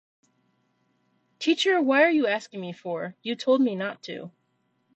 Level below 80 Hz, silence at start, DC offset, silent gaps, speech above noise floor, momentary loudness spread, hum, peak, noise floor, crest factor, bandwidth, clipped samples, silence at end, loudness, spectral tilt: -78 dBFS; 1.4 s; under 0.1%; none; 47 dB; 17 LU; none; -8 dBFS; -72 dBFS; 20 dB; 8.6 kHz; under 0.1%; 0.65 s; -24 LUFS; -4.5 dB/octave